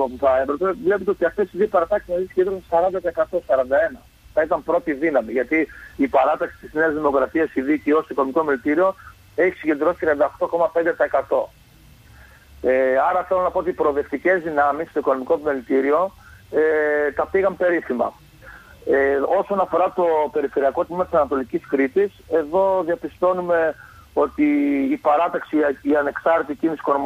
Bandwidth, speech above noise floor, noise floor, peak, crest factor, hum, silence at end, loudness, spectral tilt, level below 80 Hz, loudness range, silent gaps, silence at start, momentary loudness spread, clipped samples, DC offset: 15 kHz; 29 dB; -49 dBFS; -6 dBFS; 14 dB; none; 0 s; -20 LUFS; -7 dB/octave; -50 dBFS; 1 LU; none; 0 s; 5 LU; under 0.1%; under 0.1%